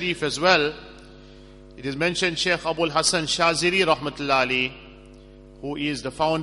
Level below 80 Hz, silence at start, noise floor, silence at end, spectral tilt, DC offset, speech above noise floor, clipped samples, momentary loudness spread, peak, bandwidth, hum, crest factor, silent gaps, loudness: -50 dBFS; 0 s; -46 dBFS; 0 s; -3 dB/octave; under 0.1%; 23 dB; under 0.1%; 11 LU; -2 dBFS; 11.5 kHz; none; 22 dB; none; -22 LUFS